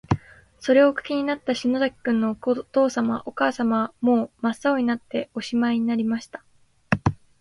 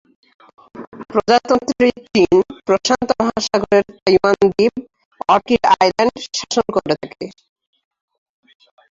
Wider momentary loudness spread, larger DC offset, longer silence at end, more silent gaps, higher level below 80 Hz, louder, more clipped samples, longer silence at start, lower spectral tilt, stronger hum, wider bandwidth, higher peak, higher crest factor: second, 7 LU vs 14 LU; neither; second, 0.25 s vs 1.6 s; second, none vs 0.87-0.92 s, 4.02-4.06 s, 5.05-5.11 s; about the same, -48 dBFS vs -50 dBFS; second, -23 LUFS vs -16 LUFS; neither; second, 0.1 s vs 0.75 s; first, -6.5 dB/octave vs -4.5 dB/octave; neither; first, 11.5 kHz vs 7.8 kHz; about the same, -4 dBFS vs -2 dBFS; about the same, 18 dB vs 16 dB